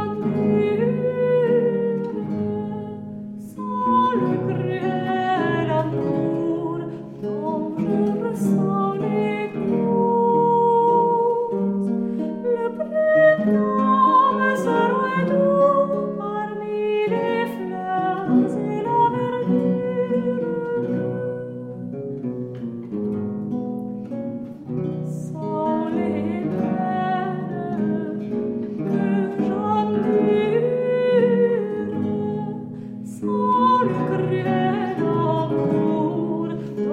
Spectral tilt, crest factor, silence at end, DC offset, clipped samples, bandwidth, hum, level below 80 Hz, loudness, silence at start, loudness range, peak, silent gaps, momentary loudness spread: -8.5 dB/octave; 16 dB; 0 s; under 0.1%; under 0.1%; 11 kHz; none; -60 dBFS; -22 LUFS; 0 s; 7 LU; -6 dBFS; none; 12 LU